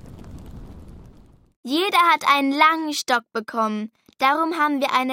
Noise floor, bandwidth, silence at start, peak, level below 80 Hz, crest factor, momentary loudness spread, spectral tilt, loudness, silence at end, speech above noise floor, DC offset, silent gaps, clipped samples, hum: -49 dBFS; 16.5 kHz; 0.05 s; -4 dBFS; -50 dBFS; 18 dB; 24 LU; -3 dB/octave; -20 LUFS; 0 s; 29 dB; under 0.1%; 1.56-1.63 s; under 0.1%; none